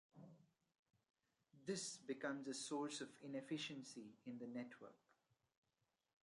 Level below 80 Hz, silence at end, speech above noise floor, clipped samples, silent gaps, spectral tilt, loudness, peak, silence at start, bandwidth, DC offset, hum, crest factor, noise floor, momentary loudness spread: under -90 dBFS; 1.3 s; 40 dB; under 0.1%; 0.79-0.86 s; -3.5 dB/octave; -50 LUFS; -34 dBFS; 0.15 s; 11.5 kHz; under 0.1%; none; 20 dB; -90 dBFS; 16 LU